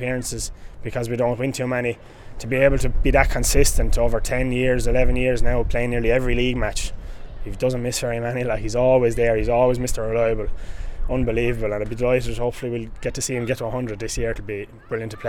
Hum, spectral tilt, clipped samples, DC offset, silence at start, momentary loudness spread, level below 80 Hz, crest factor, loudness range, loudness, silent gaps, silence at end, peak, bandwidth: none; -5 dB/octave; under 0.1%; under 0.1%; 0 s; 12 LU; -26 dBFS; 18 dB; 4 LU; -22 LUFS; none; 0 s; -2 dBFS; 18 kHz